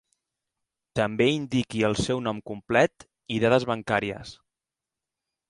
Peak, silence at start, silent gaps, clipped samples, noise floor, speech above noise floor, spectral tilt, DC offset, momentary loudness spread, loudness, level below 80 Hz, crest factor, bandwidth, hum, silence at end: -6 dBFS; 0.95 s; none; under 0.1%; -89 dBFS; 64 dB; -5.5 dB/octave; under 0.1%; 11 LU; -25 LUFS; -54 dBFS; 20 dB; 11.5 kHz; none; 1.15 s